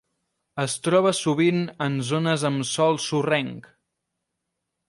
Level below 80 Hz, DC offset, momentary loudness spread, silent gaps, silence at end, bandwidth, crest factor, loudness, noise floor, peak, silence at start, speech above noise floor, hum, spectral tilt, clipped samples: -68 dBFS; under 0.1%; 9 LU; none; 1.3 s; 11.5 kHz; 18 dB; -23 LUFS; -81 dBFS; -8 dBFS; 0.55 s; 58 dB; none; -5 dB/octave; under 0.1%